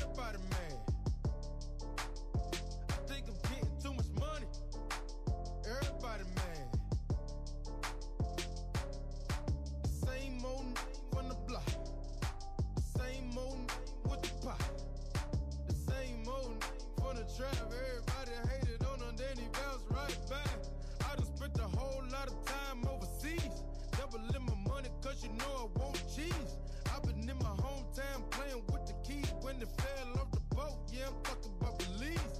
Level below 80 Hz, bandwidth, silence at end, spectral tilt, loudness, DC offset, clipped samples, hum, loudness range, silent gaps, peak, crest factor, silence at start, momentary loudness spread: -42 dBFS; 15 kHz; 0 s; -5.5 dB/octave; -42 LUFS; under 0.1%; under 0.1%; none; 1 LU; none; -26 dBFS; 14 dB; 0 s; 5 LU